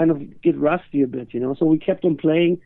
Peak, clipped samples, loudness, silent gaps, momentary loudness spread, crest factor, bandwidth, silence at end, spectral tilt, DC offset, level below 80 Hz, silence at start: -6 dBFS; under 0.1%; -20 LUFS; none; 5 LU; 14 dB; 3.9 kHz; 0.05 s; -11.5 dB/octave; under 0.1%; -56 dBFS; 0 s